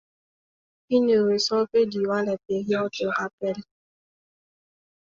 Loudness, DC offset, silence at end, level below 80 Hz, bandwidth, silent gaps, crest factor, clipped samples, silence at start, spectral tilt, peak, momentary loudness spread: -24 LUFS; under 0.1%; 1.45 s; -68 dBFS; 7.6 kHz; 3.33-3.38 s; 16 dB; under 0.1%; 0.9 s; -5 dB/octave; -10 dBFS; 9 LU